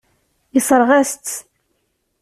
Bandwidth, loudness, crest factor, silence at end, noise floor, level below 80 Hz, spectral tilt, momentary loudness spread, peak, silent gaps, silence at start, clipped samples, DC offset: 15 kHz; -16 LUFS; 16 dB; 0.8 s; -68 dBFS; -60 dBFS; -3 dB/octave; 14 LU; -2 dBFS; none; 0.55 s; under 0.1%; under 0.1%